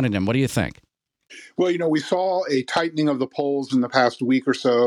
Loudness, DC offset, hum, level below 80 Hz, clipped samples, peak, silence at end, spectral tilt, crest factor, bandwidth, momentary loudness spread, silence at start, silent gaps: -22 LUFS; under 0.1%; none; -54 dBFS; under 0.1%; -4 dBFS; 0 s; -6 dB/octave; 18 dB; 15.5 kHz; 4 LU; 0 s; none